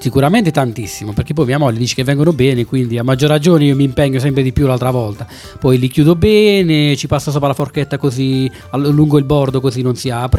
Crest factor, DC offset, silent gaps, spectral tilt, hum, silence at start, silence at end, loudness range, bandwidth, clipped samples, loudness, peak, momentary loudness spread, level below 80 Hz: 12 dB; under 0.1%; none; -6.5 dB/octave; none; 0 s; 0 s; 2 LU; 15 kHz; under 0.1%; -13 LUFS; 0 dBFS; 8 LU; -36 dBFS